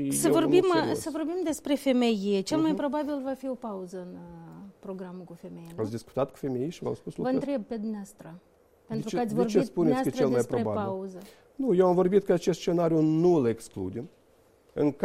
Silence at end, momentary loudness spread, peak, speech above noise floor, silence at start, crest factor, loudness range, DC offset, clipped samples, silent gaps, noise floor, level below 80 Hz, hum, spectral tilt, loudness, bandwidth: 0 s; 19 LU; -10 dBFS; 34 dB; 0 s; 18 dB; 10 LU; under 0.1%; under 0.1%; none; -61 dBFS; -62 dBFS; none; -6 dB/octave; -27 LUFS; 15.5 kHz